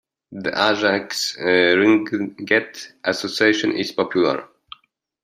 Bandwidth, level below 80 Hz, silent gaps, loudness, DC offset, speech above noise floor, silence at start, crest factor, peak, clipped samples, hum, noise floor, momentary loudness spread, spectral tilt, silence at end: 15 kHz; -66 dBFS; none; -19 LUFS; under 0.1%; 40 dB; 0.3 s; 18 dB; -2 dBFS; under 0.1%; none; -60 dBFS; 11 LU; -4 dB/octave; 0.8 s